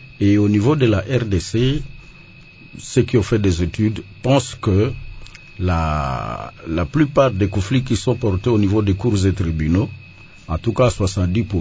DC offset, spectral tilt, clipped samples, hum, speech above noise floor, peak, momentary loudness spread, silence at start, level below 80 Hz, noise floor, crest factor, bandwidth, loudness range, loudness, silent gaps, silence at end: under 0.1%; -7 dB/octave; under 0.1%; none; 25 dB; -2 dBFS; 11 LU; 0 s; -32 dBFS; -42 dBFS; 16 dB; 8 kHz; 2 LU; -19 LUFS; none; 0 s